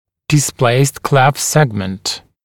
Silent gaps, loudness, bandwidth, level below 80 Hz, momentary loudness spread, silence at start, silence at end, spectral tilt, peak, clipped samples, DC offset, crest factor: none; -14 LUFS; 17.5 kHz; -48 dBFS; 8 LU; 0.3 s; 0.25 s; -4.5 dB/octave; 0 dBFS; under 0.1%; under 0.1%; 14 dB